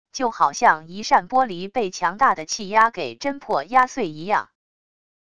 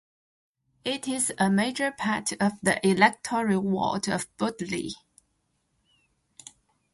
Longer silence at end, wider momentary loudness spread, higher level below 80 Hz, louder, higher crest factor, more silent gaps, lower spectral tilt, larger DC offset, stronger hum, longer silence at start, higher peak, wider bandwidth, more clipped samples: second, 0.8 s vs 2 s; about the same, 8 LU vs 10 LU; about the same, -60 dBFS vs -64 dBFS; first, -21 LUFS vs -26 LUFS; about the same, 20 dB vs 24 dB; neither; about the same, -3 dB/octave vs -4 dB/octave; first, 0.5% vs under 0.1%; neither; second, 0.15 s vs 0.85 s; about the same, -2 dBFS vs -4 dBFS; about the same, 11 kHz vs 11.5 kHz; neither